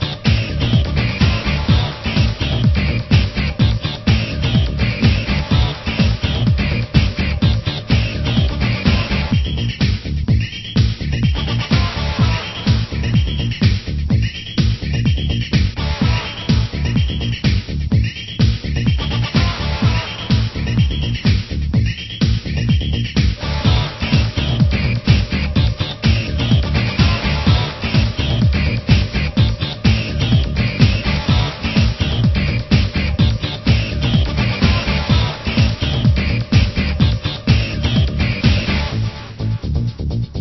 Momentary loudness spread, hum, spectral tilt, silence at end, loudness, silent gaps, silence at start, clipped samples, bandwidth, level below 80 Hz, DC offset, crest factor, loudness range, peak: 4 LU; none; -6.5 dB/octave; 0 s; -17 LUFS; none; 0 s; under 0.1%; 6 kHz; -22 dBFS; under 0.1%; 16 dB; 2 LU; 0 dBFS